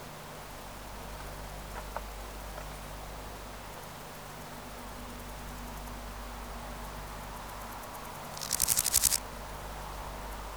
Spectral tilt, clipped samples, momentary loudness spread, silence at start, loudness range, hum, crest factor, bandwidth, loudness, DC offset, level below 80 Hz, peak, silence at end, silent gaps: -1.5 dB/octave; under 0.1%; 17 LU; 0 s; 12 LU; 50 Hz at -50 dBFS; 30 dB; over 20 kHz; -36 LUFS; under 0.1%; -46 dBFS; -8 dBFS; 0 s; none